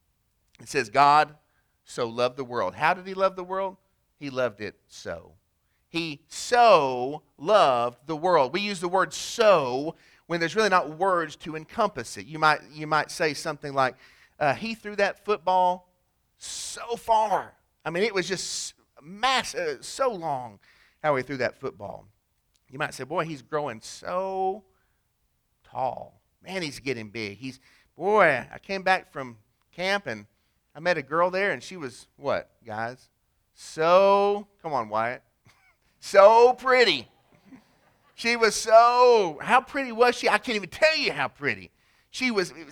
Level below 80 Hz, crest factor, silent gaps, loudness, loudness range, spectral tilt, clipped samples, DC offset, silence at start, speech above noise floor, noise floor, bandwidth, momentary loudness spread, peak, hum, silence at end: -64 dBFS; 24 dB; none; -24 LUFS; 11 LU; -3.5 dB/octave; under 0.1%; under 0.1%; 0.6 s; 48 dB; -72 dBFS; 17 kHz; 18 LU; 0 dBFS; none; 0 s